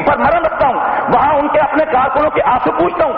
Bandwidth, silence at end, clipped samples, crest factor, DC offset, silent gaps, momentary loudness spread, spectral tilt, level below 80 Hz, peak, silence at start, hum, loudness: 5.2 kHz; 0 s; under 0.1%; 10 dB; under 0.1%; none; 2 LU; -4 dB/octave; -38 dBFS; -2 dBFS; 0 s; none; -13 LUFS